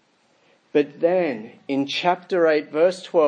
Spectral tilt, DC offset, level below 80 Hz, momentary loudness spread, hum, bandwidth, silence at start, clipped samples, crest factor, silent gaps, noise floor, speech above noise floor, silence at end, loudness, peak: -5.5 dB/octave; under 0.1%; -82 dBFS; 7 LU; none; 9.8 kHz; 0.75 s; under 0.1%; 16 dB; none; -61 dBFS; 41 dB; 0 s; -22 LUFS; -6 dBFS